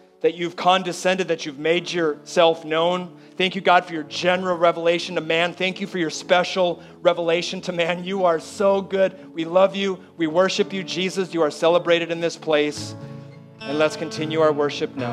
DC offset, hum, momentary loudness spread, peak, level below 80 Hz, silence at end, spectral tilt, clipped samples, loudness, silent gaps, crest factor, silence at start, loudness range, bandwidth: under 0.1%; none; 8 LU; -2 dBFS; -72 dBFS; 0 s; -4.5 dB/octave; under 0.1%; -21 LUFS; none; 20 dB; 0.25 s; 2 LU; 12.5 kHz